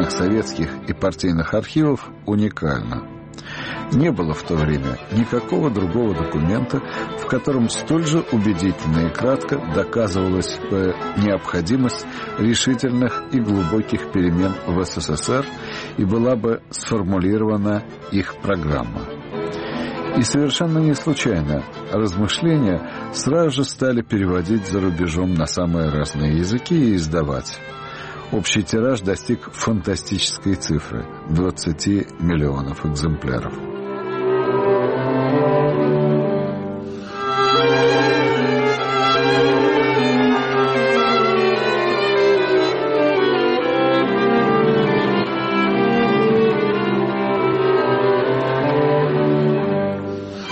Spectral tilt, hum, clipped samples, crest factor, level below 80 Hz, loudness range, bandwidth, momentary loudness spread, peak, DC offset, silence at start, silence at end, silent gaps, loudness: -5.5 dB/octave; none; under 0.1%; 12 dB; -40 dBFS; 5 LU; 8.8 kHz; 9 LU; -6 dBFS; under 0.1%; 0 s; 0 s; none; -19 LUFS